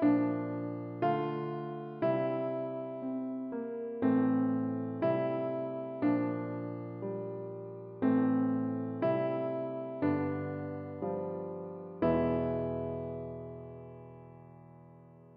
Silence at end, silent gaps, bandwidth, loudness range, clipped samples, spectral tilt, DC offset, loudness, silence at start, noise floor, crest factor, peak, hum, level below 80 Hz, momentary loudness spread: 0 s; none; 5 kHz; 3 LU; under 0.1%; -8 dB/octave; under 0.1%; -34 LUFS; 0 s; -55 dBFS; 16 dB; -18 dBFS; none; -64 dBFS; 14 LU